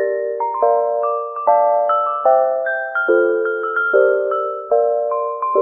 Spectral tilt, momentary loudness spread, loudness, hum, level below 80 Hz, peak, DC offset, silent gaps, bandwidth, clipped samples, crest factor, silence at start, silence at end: -7 dB/octave; 6 LU; -17 LUFS; none; -68 dBFS; -2 dBFS; under 0.1%; none; 3.8 kHz; under 0.1%; 16 dB; 0 s; 0 s